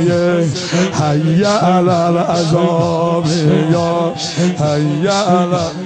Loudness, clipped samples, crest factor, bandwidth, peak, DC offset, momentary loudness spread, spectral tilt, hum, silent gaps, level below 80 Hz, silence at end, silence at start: -14 LUFS; under 0.1%; 12 dB; 9.4 kHz; -2 dBFS; under 0.1%; 4 LU; -6 dB/octave; none; none; -50 dBFS; 0 s; 0 s